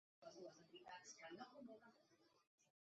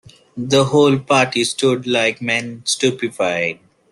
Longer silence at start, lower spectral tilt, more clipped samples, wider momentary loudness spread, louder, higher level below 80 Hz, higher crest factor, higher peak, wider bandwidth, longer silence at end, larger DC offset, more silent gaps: second, 0.2 s vs 0.35 s; second, -2 dB/octave vs -4 dB/octave; neither; second, 6 LU vs 9 LU; second, -61 LUFS vs -17 LUFS; second, under -90 dBFS vs -58 dBFS; about the same, 20 dB vs 16 dB; second, -44 dBFS vs -2 dBFS; second, 7.6 kHz vs 12.5 kHz; second, 0.2 s vs 0.4 s; neither; first, 2.47-2.58 s vs none